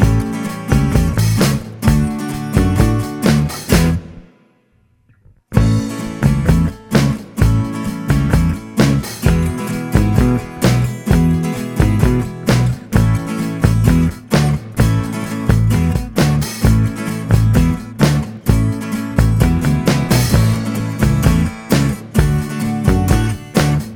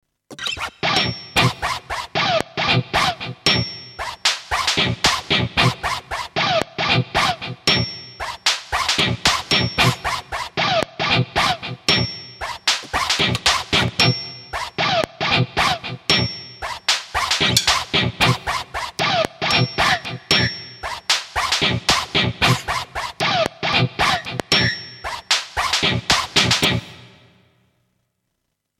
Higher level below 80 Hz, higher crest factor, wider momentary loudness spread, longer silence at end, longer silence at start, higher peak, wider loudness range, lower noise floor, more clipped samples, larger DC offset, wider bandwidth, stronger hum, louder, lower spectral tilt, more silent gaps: first, -22 dBFS vs -42 dBFS; second, 14 dB vs 20 dB; second, 5 LU vs 10 LU; second, 0 s vs 1.75 s; second, 0 s vs 0.3 s; about the same, 0 dBFS vs 0 dBFS; about the same, 3 LU vs 2 LU; second, -56 dBFS vs -75 dBFS; neither; neither; first, over 20 kHz vs 16.5 kHz; neither; first, -16 LUFS vs -19 LUFS; first, -6.5 dB/octave vs -3 dB/octave; neither